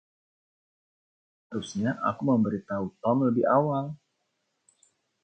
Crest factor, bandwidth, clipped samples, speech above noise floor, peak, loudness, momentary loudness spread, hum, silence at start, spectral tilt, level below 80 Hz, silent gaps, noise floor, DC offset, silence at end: 20 dB; 8.8 kHz; under 0.1%; 51 dB; -10 dBFS; -27 LUFS; 14 LU; none; 1.5 s; -7.5 dB/octave; -66 dBFS; none; -77 dBFS; under 0.1%; 1.3 s